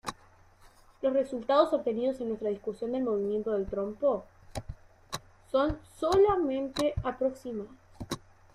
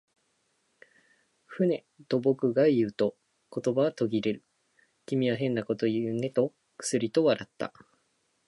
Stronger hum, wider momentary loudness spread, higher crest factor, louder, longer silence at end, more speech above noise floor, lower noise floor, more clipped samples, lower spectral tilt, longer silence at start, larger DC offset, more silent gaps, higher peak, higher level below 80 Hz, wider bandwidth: neither; first, 16 LU vs 12 LU; about the same, 20 dB vs 18 dB; about the same, -30 LUFS vs -29 LUFS; second, 0.35 s vs 0.8 s; second, 29 dB vs 46 dB; second, -58 dBFS vs -73 dBFS; neither; about the same, -6 dB/octave vs -6 dB/octave; second, 0.05 s vs 1.5 s; neither; neither; about the same, -10 dBFS vs -12 dBFS; first, -52 dBFS vs -74 dBFS; first, 15 kHz vs 11.5 kHz